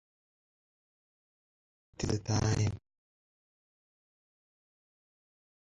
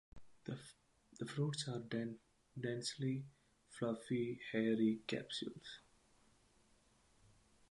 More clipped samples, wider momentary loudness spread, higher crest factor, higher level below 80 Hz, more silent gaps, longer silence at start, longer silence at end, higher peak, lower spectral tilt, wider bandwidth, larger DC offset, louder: neither; second, 9 LU vs 19 LU; about the same, 24 dB vs 20 dB; first, -54 dBFS vs -76 dBFS; neither; first, 2 s vs 0.15 s; first, 3.05 s vs 1.9 s; first, -16 dBFS vs -24 dBFS; about the same, -5.5 dB/octave vs -5.5 dB/octave; about the same, 10.5 kHz vs 11.5 kHz; neither; first, -33 LUFS vs -42 LUFS